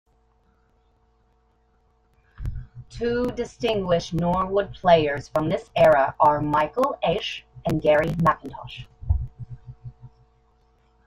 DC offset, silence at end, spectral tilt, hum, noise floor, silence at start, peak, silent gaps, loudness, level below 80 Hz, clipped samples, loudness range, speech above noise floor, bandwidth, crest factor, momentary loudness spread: under 0.1%; 1 s; -6.5 dB/octave; none; -63 dBFS; 2.4 s; -4 dBFS; none; -22 LUFS; -42 dBFS; under 0.1%; 10 LU; 42 dB; 15.5 kHz; 20 dB; 21 LU